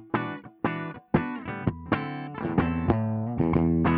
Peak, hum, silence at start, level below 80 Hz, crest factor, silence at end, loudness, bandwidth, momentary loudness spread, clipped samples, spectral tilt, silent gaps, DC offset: -6 dBFS; none; 0 s; -46 dBFS; 20 dB; 0 s; -28 LUFS; 4.7 kHz; 9 LU; under 0.1%; -12 dB/octave; none; under 0.1%